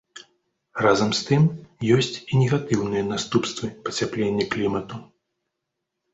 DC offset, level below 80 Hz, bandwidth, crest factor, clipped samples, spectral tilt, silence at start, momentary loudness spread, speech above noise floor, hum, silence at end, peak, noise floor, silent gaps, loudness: under 0.1%; -54 dBFS; 8.2 kHz; 20 dB; under 0.1%; -5.5 dB/octave; 0.15 s; 10 LU; 59 dB; none; 1.1 s; -4 dBFS; -81 dBFS; none; -23 LUFS